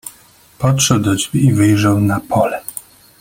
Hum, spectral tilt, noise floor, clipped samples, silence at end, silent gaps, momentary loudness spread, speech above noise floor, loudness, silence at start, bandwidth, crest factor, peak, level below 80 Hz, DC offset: none; -5 dB/octave; -47 dBFS; under 0.1%; 0.4 s; none; 15 LU; 33 dB; -14 LUFS; 0.05 s; 17 kHz; 16 dB; 0 dBFS; -46 dBFS; under 0.1%